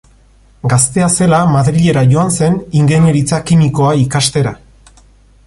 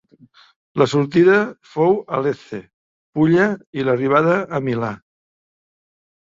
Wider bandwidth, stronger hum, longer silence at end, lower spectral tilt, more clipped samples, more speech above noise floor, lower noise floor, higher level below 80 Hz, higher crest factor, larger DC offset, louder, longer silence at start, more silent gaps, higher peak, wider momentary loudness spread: first, 11.5 kHz vs 7.8 kHz; neither; second, 0.9 s vs 1.4 s; second, -5.5 dB/octave vs -7.5 dB/octave; neither; about the same, 35 dB vs 33 dB; second, -45 dBFS vs -50 dBFS; first, -38 dBFS vs -58 dBFS; second, 12 dB vs 18 dB; neither; first, -11 LUFS vs -18 LUFS; about the same, 0.65 s vs 0.75 s; second, none vs 2.73-3.13 s, 3.67-3.73 s; about the same, 0 dBFS vs -2 dBFS; second, 4 LU vs 15 LU